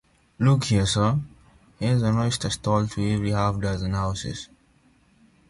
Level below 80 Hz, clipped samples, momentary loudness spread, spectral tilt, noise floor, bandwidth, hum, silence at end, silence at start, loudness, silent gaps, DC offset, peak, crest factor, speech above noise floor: -44 dBFS; under 0.1%; 10 LU; -6 dB/octave; -60 dBFS; 11.5 kHz; none; 1.05 s; 0.4 s; -24 LUFS; none; under 0.1%; -8 dBFS; 16 dB; 37 dB